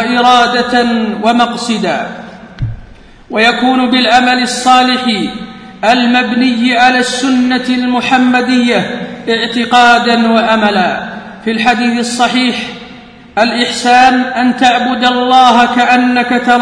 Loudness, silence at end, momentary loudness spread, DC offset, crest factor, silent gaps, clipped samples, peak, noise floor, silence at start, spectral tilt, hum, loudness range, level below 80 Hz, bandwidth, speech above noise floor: -10 LUFS; 0 s; 13 LU; under 0.1%; 10 dB; none; 0.5%; 0 dBFS; -35 dBFS; 0 s; -3.5 dB/octave; none; 4 LU; -40 dBFS; 10.5 kHz; 26 dB